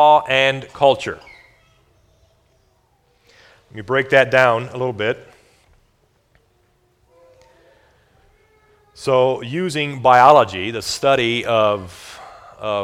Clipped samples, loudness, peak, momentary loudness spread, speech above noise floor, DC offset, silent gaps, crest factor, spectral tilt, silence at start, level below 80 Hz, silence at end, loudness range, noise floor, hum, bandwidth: under 0.1%; -16 LUFS; 0 dBFS; 21 LU; 45 dB; under 0.1%; none; 20 dB; -4.5 dB/octave; 0 s; -56 dBFS; 0 s; 13 LU; -61 dBFS; none; 15.5 kHz